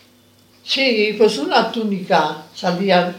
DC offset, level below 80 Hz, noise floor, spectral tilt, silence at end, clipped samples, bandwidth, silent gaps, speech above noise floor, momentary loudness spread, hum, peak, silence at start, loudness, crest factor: under 0.1%; -72 dBFS; -52 dBFS; -5 dB/octave; 0 s; under 0.1%; 16.5 kHz; none; 35 dB; 8 LU; none; 0 dBFS; 0.65 s; -17 LUFS; 18 dB